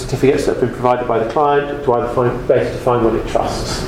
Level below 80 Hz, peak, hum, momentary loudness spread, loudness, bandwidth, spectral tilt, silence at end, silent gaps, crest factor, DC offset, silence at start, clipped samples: -32 dBFS; 0 dBFS; none; 3 LU; -16 LUFS; 15.5 kHz; -6 dB/octave; 0 s; none; 16 dB; under 0.1%; 0 s; under 0.1%